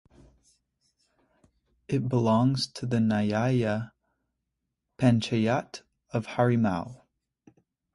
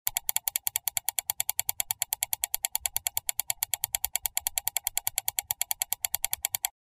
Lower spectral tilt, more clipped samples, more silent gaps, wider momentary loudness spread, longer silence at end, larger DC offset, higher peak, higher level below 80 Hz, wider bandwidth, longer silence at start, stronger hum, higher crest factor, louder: first, -7 dB/octave vs 2.5 dB/octave; neither; neither; first, 11 LU vs 2 LU; first, 1 s vs 0.15 s; neither; second, -10 dBFS vs -6 dBFS; about the same, -60 dBFS vs -60 dBFS; second, 11.5 kHz vs 16 kHz; first, 1.9 s vs 0.05 s; neither; second, 20 dB vs 26 dB; about the same, -27 LUFS vs -29 LUFS